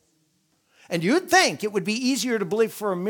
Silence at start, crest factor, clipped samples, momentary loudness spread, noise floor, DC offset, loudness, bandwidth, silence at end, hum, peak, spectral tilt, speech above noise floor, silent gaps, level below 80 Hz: 0.9 s; 20 dB; under 0.1%; 8 LU; -68 dBFS; under 0.1%; -22 LUFS; 19.5 kHz; 0 s; none; -4 dBFS; -3.5 dB/octave; 45 dB; none; -72 dBFS